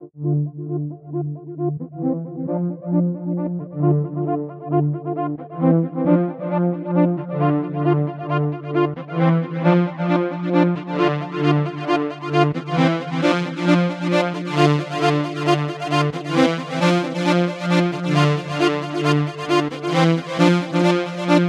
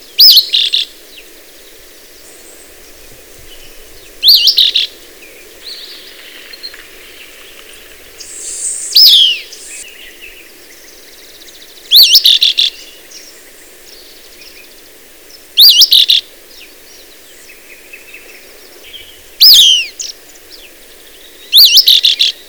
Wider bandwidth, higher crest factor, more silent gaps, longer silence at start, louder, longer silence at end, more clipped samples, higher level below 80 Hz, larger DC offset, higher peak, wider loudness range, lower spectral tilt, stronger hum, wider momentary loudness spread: second, 10.5 kHz vs over 20 kHz; about the same, 18 dB vs 14 dB; neither; second, 0 s vs 0.2 s; second, -20 LUFS vs -5 LUFS; second, 0 s vs 0.2 s; second, under 0.1% vs 0.5%; second, -64 dBFS vs -48 dBFS; second, under 0.1% vs 0.5%; about the same, -2 dBFS vs 0 dBFS; second, 4 LU vs 10 LU; first, -7 dB/octave vs 3 dB/octave; neither; second, 7 LU vs 25 LU